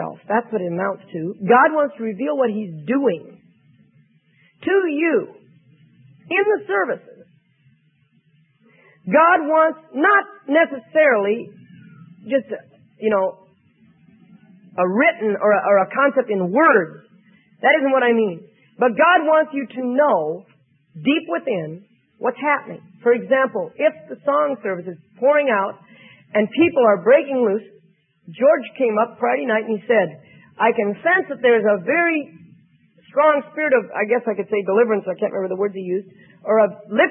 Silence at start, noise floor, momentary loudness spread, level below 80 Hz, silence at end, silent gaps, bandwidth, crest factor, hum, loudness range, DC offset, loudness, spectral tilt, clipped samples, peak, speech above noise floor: 0 s; -60 dBFS; 11 LU; -76 dBFS; 0 s; none; 3.7 kHz; 18 dB; none; 6 LU; under 0.1%; -19 LUFS; -10.5 dB/octave; under 0.1%; -2 dBFS; 42 dB